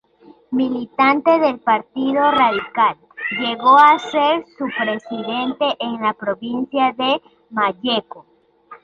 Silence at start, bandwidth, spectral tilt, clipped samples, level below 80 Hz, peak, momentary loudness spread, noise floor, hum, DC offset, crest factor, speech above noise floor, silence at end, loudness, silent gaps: 0.5 s; 7.6 kHz; -5 dB/octave; under 0.1%; -62 dBFS; -2 dBFS; 11 LU; -49 dBFS; none; under 0.1%; 16 dB; 31 dB; 0.1 s; -18 LUFS; none